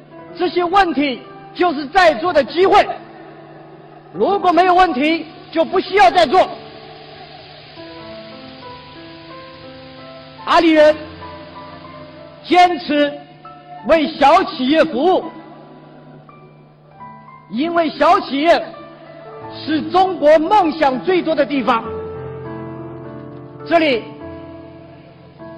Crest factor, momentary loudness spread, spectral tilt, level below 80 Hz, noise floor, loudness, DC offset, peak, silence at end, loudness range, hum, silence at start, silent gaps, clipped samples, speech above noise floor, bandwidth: 14 dB; 24 LU; -5 dB/octave; -48 dBFS; -44 dBFS; -15 LUFS; under 0.1%; -2 dBFS; 0 s; 7 LU; none; 0.15 s; none; under 0.1%; 30 dB; 11 kHz